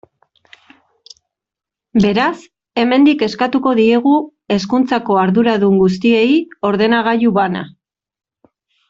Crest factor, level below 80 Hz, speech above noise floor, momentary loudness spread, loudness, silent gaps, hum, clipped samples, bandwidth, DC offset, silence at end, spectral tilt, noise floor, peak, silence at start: 14 dB; -52 dBFS; 73 dB; 8 LU; -14 LUFS; none; none; under 0.1%; 7.6 kHz; under 0.1%; 1.2 s; -7 dB/octave; -86 dBFS; -2 dBFS; 1.95 s